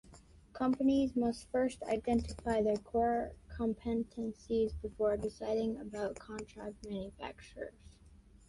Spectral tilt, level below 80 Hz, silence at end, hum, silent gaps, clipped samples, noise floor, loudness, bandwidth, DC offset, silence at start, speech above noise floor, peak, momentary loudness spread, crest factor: -6.5 dB/octave; -54 dBFS; 0.35 s; none; none; under 0.1%; -60 dBFS; -36 LUFS; 11.5 kHz; under 0.1%; 0.05 s; 25 dB; -20 dBFS; 15 LU; 14 dB